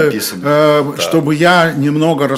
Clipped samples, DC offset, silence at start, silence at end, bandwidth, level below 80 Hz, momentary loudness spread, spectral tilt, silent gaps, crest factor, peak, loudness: under 0.1%; under 0.1%; 0 s; 0 s; 16.5 kHz; -56 dBFS; 5 LU; -5 dB/octave; none; 12 dB; 0 dBFS; -12 LUFS